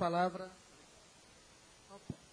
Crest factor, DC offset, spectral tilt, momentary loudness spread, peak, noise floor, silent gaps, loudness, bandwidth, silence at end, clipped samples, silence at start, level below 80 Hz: 20 dB; under 0.1%; -6 dB/octave; 24 LU; -20 dBFS; -62 dBFS; none; -39 LUFS; 10.5 kHz; 0.15 s; under 0.1%; 0 s; -72 dBFS